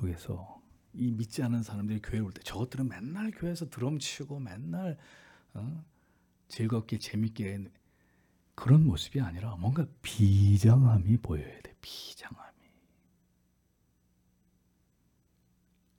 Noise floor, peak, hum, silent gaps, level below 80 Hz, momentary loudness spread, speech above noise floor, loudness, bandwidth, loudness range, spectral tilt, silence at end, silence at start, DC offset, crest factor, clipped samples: -72 dBFS; -12 dBFS; none; none; -56 dBFS; 21 LU; 42 dB; -30 LUFS; 16 kHz; 12 LU; -7 dB/octave; 3.55 s; 0 s; under 0.1%; 20 dB; under 0.1%